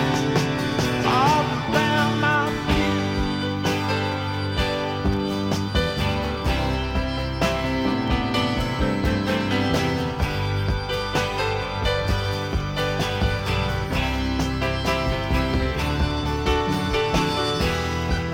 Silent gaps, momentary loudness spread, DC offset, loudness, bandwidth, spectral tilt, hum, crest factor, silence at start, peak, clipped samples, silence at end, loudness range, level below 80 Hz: none; 4 LU; under 0.1%; -23 LUFS; 17 kHz; -5.5 dB/octave; none; 18 dB; 0 s; -6 dBFS; under 0.1%; 0 s; 3 LU; -32 dBFS